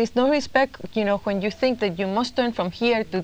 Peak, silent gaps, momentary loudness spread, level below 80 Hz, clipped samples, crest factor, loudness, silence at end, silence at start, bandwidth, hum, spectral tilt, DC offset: -6 dBFS; none; 5 LU; -52 dBFS; under 0.1%; 16 dB; -23 LUFS; 0 s; 0 s; 16.5 kHz; none; -5.5 dB/octave; under 0.1%